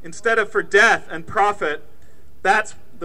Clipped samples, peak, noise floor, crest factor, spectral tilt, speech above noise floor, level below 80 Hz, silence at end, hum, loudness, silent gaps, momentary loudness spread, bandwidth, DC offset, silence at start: under 0.1%; -2 dBFS; -51 dBFS; 18 dB; -2.5 dB/octave; 32 dB; -54 dBFS; 0 s; none; -18 LUFS; none; 12 LU; 13 kHz; 3%; 0.05 s